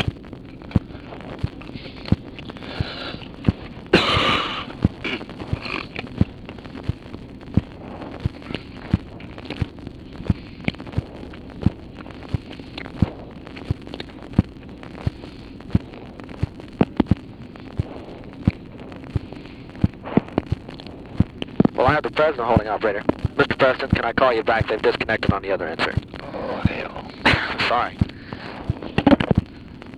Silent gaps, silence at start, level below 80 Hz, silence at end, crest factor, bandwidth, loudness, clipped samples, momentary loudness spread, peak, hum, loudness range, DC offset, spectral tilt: none; 0 s; -38 dBFS; 0 s; 24 dB; 11.5 kHz; -23 LUFS; under 0.1%; 19 LU; 0 dBFS; none; 9 LU; under 0.1%; -7 dB/octave